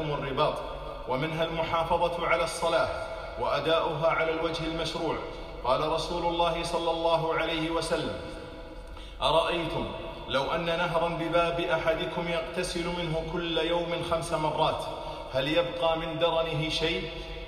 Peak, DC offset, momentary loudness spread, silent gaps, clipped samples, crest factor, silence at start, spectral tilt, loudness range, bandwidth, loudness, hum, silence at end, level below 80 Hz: -10 dBFS; under 0.1%; 10 LU; none; under 0.1%; 18 dB; 0 s; -4.5 dB/octave; 2 LU; 15 kHz; -29 LUFS; none; 0 s; -46 dBFS